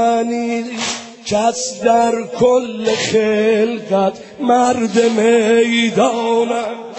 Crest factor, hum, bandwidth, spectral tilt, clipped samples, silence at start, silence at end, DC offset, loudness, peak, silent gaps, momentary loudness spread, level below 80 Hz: 14 dB; none; 8.4 kHz; -4 dB/octave; under 0.1%; 0 s; 0 s; under 0.1%; -15 LUFS; 0 dBFS; none; 8 LU; -56 dBFS